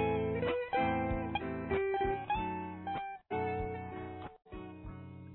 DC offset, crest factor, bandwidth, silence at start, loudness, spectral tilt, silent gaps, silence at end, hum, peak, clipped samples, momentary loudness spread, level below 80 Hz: under 0.1%; 14 dB; 4 kHz; 0 s; -36 LUFS; -5 dB/octave; none; 0 s; none; -22 dBFS; under 0.1%; 16 LU; -52 dBFS